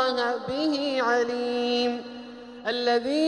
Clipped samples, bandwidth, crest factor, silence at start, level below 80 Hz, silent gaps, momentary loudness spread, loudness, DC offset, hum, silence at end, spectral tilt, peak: under 0.1%; 10.5 kHz; 16 dB; 0 s; -66 dBFS; none; 12 LU; -26 LUFS; under 0.1%; none; 0 s; -3.5 dB/octave; -10 dBFS